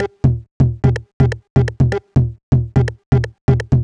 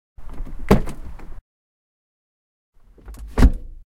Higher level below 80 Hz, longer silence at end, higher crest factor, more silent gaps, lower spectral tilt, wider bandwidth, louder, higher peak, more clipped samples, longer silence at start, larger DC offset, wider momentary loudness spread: about the same, -28 dBFS vs -26 dBFS; second, 0 s vs 0.15 s; second, 14 dB vs 22 dB; second, 0.51-0.60 s, 1.13-1.20 s, 1.50-1.56 s, 2.43-2.52 s, 3.06-3.12 s, 3.41-3.48 s vs 1.41-2.73 s; first, -9 dB/octave vs -7.5 dB/octave; second, 7.2 kHz vs 16.5 kHz; first, -17 LUFS vs -20 LUFS; about the same, -2 dBFS vs 0 dBFS; neither; second, 0 s vs 0.2 s; neither; second, 3 LU vs 24 LU